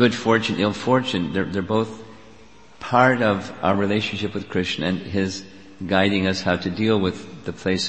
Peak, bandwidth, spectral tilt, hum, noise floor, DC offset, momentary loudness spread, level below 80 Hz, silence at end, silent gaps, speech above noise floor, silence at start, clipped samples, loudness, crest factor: 0 dBFS; 8.6 kHz; -5.5 dB/octave; none; -49 dBFS; 0.4%; 11 LU; -52 dBFS; 0 s; none; 27 dB; 0 s; under 0.1%; -22 LUFS; 22 dB